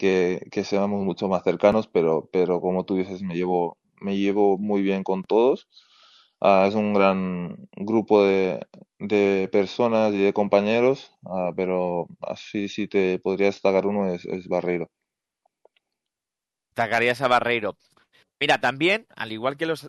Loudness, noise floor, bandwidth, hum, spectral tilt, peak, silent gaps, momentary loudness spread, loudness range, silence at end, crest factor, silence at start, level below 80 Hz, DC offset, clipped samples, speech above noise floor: -23 LUFS; -88 dBFS; 12 kHz; none; -6.5 dB/octave; -4 dBFS; none; 10 LU; 4 LU; 0 s; 18 dB; 0 s; -66 dBFS; under 0.1%; under 0.1%; 66 dB